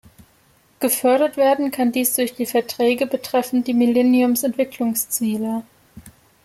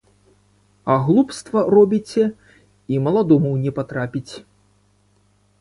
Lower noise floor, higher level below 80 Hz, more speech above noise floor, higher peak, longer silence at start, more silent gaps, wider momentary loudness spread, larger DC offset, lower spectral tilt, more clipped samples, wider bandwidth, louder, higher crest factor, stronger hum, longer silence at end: about the same, -57 dBFS vs -60 dBFS; second, -62 dBFS vs -56 dBFS; second, 38 dB vs 42 dB; second, -6 dBFS vs -2 dBFS; about the same, 0.8 s vs 0.85 s; neither; second, 6 LU vs 14 LU; neither; second, -3.5 dB/octave vs -8 dB/octave; neither; first, 16 kHz vs 11.5 kHz; about the same, -19 LUFS vs -19 LUFS; about the same, 14 dB vs 18 dB; second, none vs 50 Hz at -45 dBFS; second, 0.35 s vs 1.2 s